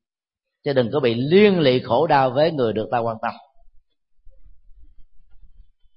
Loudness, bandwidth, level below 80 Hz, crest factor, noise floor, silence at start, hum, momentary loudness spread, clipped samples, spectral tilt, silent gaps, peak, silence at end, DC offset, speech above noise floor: -19 LUFS; 5.8 kHz; -54 dBFS; 18 dB; -86 dBFS; 0.65 s; none; 11 LU; under 0.1%; -11 dB/octave; none; -2 dBFS; 0.6 s; under 0.1%; 67 dB